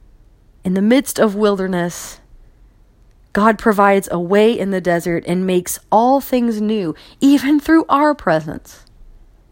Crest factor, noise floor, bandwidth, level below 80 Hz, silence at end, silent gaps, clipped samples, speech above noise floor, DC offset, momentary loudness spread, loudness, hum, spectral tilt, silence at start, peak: 16 dB; -49 dBFS; 17 kHz; -46 dBFS; 0.8 s; none; under 0.1%; 34 dB; under 0.1%; 10 LU; -16 LUFS; none; -5.5 dB/octave; 0.65 s; 0 dBFS